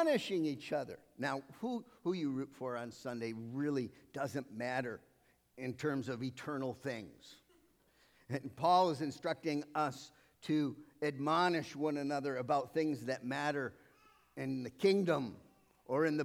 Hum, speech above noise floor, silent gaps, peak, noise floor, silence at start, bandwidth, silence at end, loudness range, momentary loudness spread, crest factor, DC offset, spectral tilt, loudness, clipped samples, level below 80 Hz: none; 33 dB; none; -18 dBFS; -70 dBFS; 0 s; 16 kHz; 0 s; 5 LU; 13 LU; 18 dB; under 0.1%; -6 dB/octave; -38 LUFS; under 0.1%; -80 dBFS